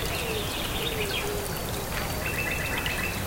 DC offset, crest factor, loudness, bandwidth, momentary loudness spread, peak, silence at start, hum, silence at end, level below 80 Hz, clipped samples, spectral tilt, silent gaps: 0.2%; 14 dB; -29 LUFS; 17 kHz; 3 LU; -14 dBFS; 0 s; none; 0 s; -38 dBFS; under 0.1%; -3.5 dB/octave; none